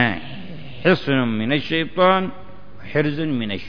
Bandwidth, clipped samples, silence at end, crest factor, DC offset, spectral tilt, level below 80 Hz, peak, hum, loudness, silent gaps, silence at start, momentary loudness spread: 5.4 kHz; under 0.1%; 0 s; 18 dB; 2%; -8 dB/octave; -50 dBFS; -2 dBFS; none; -20 LUFS; none; 0 s; 14 LU